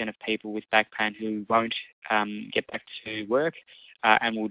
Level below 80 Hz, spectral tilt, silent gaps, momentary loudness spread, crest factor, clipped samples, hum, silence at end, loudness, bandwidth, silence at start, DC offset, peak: -68 dBFS; -8 dB/octave; 1.93-2.02 s; 11 LU; 22 dB; under 0.1%; none; 0 s; -27 LUFS; 4 kHz; 0 s; under 0.1%; -4 dBFS